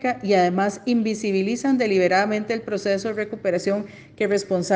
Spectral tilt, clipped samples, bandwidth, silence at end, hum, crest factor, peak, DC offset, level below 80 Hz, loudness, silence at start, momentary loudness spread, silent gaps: -5.5 dB/octave; under 0.1%; 9.8 kHz; 0 s; none; 16 dB; -6 dBFS; under 0.1%; -64 dBFS; -22 LUFS; 0 s; 7 LU; none